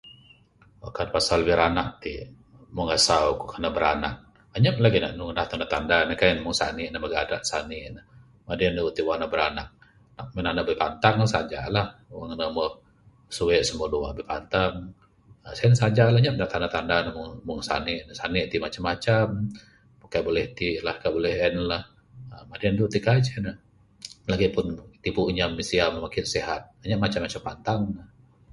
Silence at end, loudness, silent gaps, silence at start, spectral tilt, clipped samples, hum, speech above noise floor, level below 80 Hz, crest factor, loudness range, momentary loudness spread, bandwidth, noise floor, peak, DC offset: 0.45 s; -25 LUFS; none; 0.05 s; -5 dB/octave; under 0.1%; none; 32 dB; -46 dBFS; 24 dB; 4 LU; 16 LU; 11.5 kHz; -57 dBFS; -2 dBFS; under 0.1%